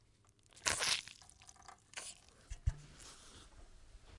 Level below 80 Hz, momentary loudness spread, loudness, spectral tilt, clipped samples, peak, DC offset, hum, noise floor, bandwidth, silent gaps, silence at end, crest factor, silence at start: -52 dBFS; 24 LU; -39 LUFS; -1 dB/octave; under 0.1%; -10 dBFS; under 0.1%; none; -69 dBFS; 11.5 kHz; none; 0 s; 34 dB; 0.55 s